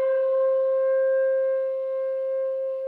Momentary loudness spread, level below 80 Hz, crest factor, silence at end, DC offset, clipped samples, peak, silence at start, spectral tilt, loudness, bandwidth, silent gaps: 5 LU; under -90 dBFS; 8 dB; 0 s; under 0.1%; under 0.1%; -16 dBFS; 0 s; -3.5 dB/octave; -24 LUFS; 3.2 kHz; none